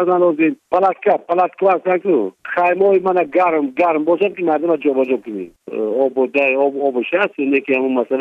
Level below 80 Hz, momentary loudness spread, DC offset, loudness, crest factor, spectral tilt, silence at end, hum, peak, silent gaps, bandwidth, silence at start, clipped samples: -66 dBFS; 5 LU; under 0.1%; -16 LUFS; 14 dB; -8 dB/octave; 0 s; none; -2 dBFS; none; 5 kHz; 0 s; under 0.1%